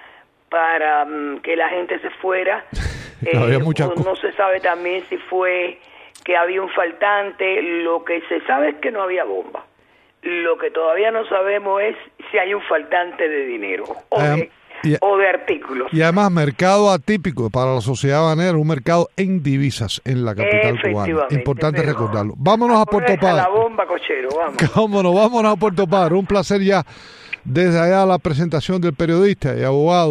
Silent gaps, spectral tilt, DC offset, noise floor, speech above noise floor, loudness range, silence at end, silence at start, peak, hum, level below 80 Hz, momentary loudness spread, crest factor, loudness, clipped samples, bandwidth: none; -6.5 dB/octave; under 0.1%; -55 dBFS; 38 dB; 4 LU; 0 s; 0.5 s; -2 dBFS; none; -44 dBFS; 9 LU; 16 dB; -18 LUFS; under 0.1%; 12 kHz